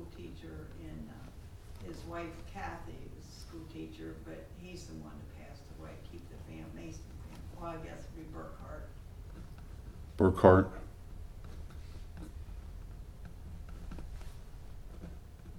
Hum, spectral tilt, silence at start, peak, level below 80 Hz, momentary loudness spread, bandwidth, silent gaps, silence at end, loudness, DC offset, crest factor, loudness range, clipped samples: none; -7.5 dB/octave; 0 s; -6 dBFS; -48 dBFS; 10 LU; 16 kHz; none; 0 s; -35 LUFS; under 0.1%; 32 dB; 18 LU; under 0.1%